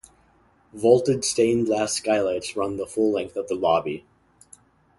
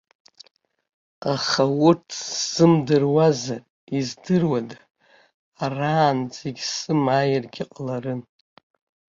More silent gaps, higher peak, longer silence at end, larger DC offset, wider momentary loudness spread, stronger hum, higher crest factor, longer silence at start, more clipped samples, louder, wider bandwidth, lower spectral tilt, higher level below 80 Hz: second, none vs 3.70-3.87 s, 4.91-4.95 s, 5.34-5.52 s; about the same, -4 dBFS vs -4 dBFS; about the same, 1 s vs 0.95 s; neither; second, 9 LU vs 14 LU; neither; about the same, 20 dB vs 20 dB; second, 0.75 s vs 1.2 s; neither; about the same, -23 LUFS vs -22 LUFS; first, 11.5 kHz vs 7.6 kHz; about the same, -4.5 dB/octave vs -5.5 dB/octave; about the same, -58 dBFS vs -62 dBFS